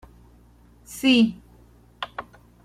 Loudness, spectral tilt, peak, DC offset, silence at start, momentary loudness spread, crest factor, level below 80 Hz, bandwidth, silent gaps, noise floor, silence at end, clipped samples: -22 LUFS; -4 dB/octave; -6 dBFS; under 0.1%; 0.9 s; 22 LU; 20 dB; -54 dBFS; 15 kHz; none; -53 dBFS; 0.45 s; under 0.1%